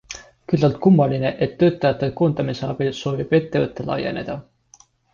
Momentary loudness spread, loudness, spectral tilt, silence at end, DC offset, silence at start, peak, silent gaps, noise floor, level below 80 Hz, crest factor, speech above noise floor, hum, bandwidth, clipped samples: 12 LU; -20 LUFS; -7.5 dB/octave; 0.7 s; under 0.1%; 0.1 s; -4 dBFS; none; -54 dBFS; -50 dBFS; 16 dB; 34 dB; none; 7.2 kHz; under 0.1%